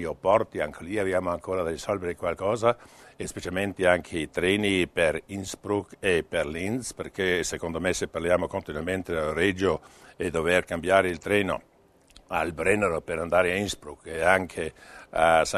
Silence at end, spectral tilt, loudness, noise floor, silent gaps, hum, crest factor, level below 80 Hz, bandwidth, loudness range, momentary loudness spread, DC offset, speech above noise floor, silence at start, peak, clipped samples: 0 s; -4.5 dB/octave; -27 LUFS; -56 dBFS; none; none; 22 dB; -50 dBFS; 13.5 kHz; 2 LU; 10 LU; under 0.1%; 30 dB; 0 s; -4 dBFS; under 0.1%